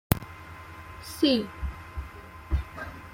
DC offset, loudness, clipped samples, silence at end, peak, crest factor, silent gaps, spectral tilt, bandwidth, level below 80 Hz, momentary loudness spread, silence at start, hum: under 0.1%; -30 LUFS; under 0.1%; 0 s; -4 dBFS; 26 dB; none; -5.5 dB/octave; 16.5 kHz; -38 dBFS; 19 LU; 0.1 s; none